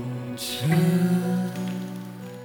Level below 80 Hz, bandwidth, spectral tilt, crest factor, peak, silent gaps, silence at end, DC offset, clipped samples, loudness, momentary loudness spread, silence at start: -68 dBFS; 20 kHz; -6.5 dB/octave; 14 dB; -10 dBFS; none; 0 s; under 0.1%; under 0.1%; -25 LUFS; 14 LU; 0 s